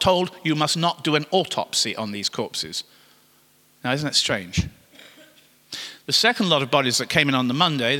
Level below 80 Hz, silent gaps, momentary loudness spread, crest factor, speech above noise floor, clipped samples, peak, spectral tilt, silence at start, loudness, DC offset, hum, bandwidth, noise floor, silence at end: -48 dBFS; none; 13 LU; 22 dB; 36 dB; under 0.1%; -2 dBFS; -3.5 dB/octave; 0 s; -21 LUFS; under 0.1%; none; 18 kHz; -58 dBFS; 0 s